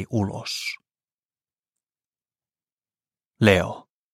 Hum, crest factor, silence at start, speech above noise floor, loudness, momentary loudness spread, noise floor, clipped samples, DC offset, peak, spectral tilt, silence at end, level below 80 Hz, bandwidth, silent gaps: none; 26 dB; 0 s; over 68 dB; -23 LUFS; 18 LU; under -90 dBFS; under 0.1%; under 0.1%; -2 dBFS; -5.5 dB/octave; 0.35 s; -56 dBFS; 15.5 kHz; 1.14-1.29 s, 1.59-1.63 s, 2.06-2.11 s, 2.72-2.78 s, 3.26-3.31 s